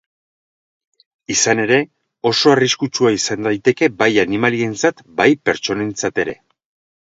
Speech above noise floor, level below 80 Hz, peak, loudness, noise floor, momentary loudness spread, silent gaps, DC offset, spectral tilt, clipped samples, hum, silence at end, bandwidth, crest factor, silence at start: over 74 dB; -56 dBFS; 0 dBFS; -16 LUFS; under -90 dBFS; 7 LU; none; under 0.1%; -3.5 dB/octave; under 0.1%; none; 0.7 s; 8 kHz; 18 dB; 1.3 s